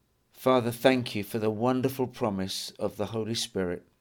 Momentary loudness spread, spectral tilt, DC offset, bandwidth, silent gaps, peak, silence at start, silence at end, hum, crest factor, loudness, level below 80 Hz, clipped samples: 8 LU; -5 dB/octave; under 0.1%; 19.5 kHz; none; -6 dBFS; 0.35 s; 0.2 s; none; 22 dB; -29 LUFS; -64 dBFS; under 0.1%